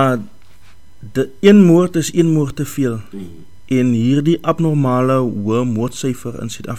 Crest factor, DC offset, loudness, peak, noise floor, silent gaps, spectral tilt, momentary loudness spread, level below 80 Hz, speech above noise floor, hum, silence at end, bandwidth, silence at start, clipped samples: 16 dB; 2%; -15 LUFS; 0 dBFS; -48 dBFS; none; -7 dB/octave; 15 LU; -48 dBFS; 33 dB; none; 0 s; 15 kHz; 0 s; under 0.1%